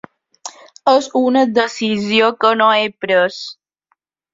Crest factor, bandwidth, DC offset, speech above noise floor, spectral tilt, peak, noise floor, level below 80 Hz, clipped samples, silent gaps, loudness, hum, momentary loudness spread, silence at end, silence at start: 16 dB; 7.8 kHz; under 0.1%; 52 dB; -4 dB/octave; 0 dBFS; -67 dBFS; -62 dBFS; under 0.1%; none; -15 LUFS; none; 19 LU; 0.8 s; 0.45 s